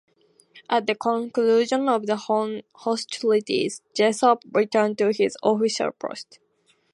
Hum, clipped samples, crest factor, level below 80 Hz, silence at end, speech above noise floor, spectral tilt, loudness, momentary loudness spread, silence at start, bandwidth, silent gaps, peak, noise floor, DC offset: none; under 0.1%; 18 dB; -76 dBFS; 0.7 s; 33 dB; -4 dB/octave; -23 LUFS; 8 LU; 0.55 s; 11.5 kHz; none; -4 dBFS; -56 dBFS; under 0.1%